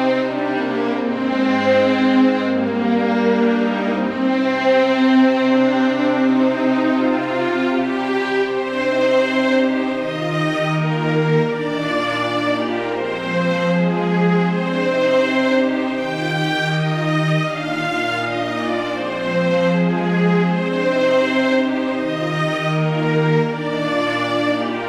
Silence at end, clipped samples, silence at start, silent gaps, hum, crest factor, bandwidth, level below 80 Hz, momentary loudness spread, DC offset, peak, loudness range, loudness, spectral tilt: 0 s; under 0.1%; 0 s; none; none; 12 dB; 10.5 kHz; -60 dBFS; 6 LU; under 0.1%; -4 dBFS; 3 LU; -18 LUFS; -7 dB/octave